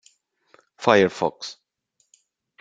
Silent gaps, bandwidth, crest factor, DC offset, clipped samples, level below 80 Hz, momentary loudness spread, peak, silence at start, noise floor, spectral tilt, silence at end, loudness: none; 9.2 kHz; 24 dB; under 0.1%; under 0.1%; -66 dBFS; 19 LU; -2 dBFS; 0.8 s; -71 dBFS; -5 dB/octave; 1.1 s; -21 LUFS